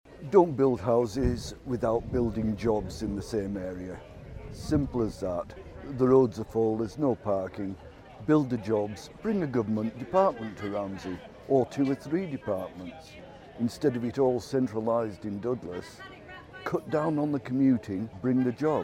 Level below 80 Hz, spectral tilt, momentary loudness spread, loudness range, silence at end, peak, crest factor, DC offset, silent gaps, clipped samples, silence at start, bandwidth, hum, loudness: -48 dBFS; -7.5 dB/octave; 17 LU; 4 LU; 0 s; -8 dBFS; 20 dB; under 0.1%; none; under 0.1%; 0.05 s; 15 kHz; none; -29 LUFS